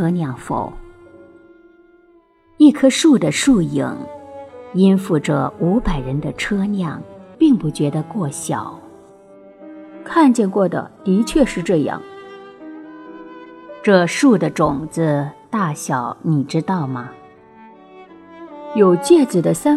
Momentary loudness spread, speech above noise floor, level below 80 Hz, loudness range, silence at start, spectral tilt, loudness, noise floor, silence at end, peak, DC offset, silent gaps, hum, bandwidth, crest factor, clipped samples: 23 LU; 36 dB; -40 dBFS; 5 LU; 0 s; -6 dB/octave; -17 LUFS; -53 dBFS; 0 s; 0 dBFS; under 0.1%; none; none; 13.5 kHz; 18 dB; under 0.1%